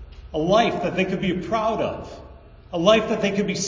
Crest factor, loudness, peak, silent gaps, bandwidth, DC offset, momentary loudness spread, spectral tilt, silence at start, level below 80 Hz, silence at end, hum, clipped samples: 20 dB; -22 LUFS; -4 dBFS; none; 7.6 kHz; under 0.1%; 14 LU; -5 dB/octave; 0 s; -44 dBFS; 0 s; none; under 0.1%